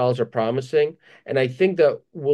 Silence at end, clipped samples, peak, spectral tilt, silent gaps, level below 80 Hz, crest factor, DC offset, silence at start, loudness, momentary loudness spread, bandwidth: 0 s; under 0.1%; -6 dBFS; -7.5 dB/octave; none; -70 dBFS; 14 dB; under 0.1%; 0 s; -22 LUFS; 8 LU; 9.8 kHz